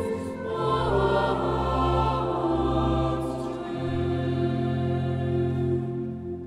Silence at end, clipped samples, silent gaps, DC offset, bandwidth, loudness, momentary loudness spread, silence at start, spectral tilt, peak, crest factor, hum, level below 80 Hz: 0 s; under 0.1%; none; under 0.1%; 11 kHz; -26 LUFS; 8 LU; 0 s; -8 dB/octave; -12 dBFS; 14 dB; none; -38 dBFS